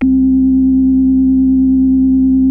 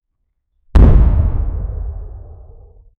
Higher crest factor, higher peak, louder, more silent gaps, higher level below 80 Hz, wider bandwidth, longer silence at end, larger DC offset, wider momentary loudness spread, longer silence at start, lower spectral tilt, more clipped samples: second, 6 dB vs 14 dB; second, -4 dBFS vs 0 dBFS; first, -11 LUFS vs -15 LUFS; neither; second, -28 dBFS vs -16 dBFS; second, 0.8 kHz vs 4.2 kHz; second, 0 s vs 0.7 s; neither; second, 0 LU vs 20 LU; second, 0 s vs 0.75 s; first, -12 dB/octave vs -10 dB/octave; neither